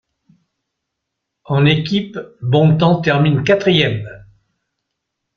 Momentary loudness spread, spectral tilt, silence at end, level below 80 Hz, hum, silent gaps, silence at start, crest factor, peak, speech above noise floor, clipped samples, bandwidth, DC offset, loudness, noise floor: 13 LU; -7.5 dB/octave; 1.2 s; -50 dBFS; none; none; 1.5 s; 16 dB; 0 dBFS; 63 dB; under 0.1%; 6.6 kHz; under 0.1%; -15 LUFS; -78 dBFS